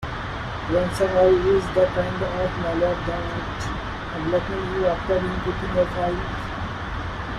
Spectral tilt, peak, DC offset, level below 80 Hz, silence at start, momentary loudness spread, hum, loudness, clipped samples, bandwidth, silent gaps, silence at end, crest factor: -6.5 dB/octave; -6 dBFS; under 0.1%; -36 dBFS; 0 s; 11 LU; none; -24 LUFS; under 0.1%; 12 kHz; none; 0 s; 16 dB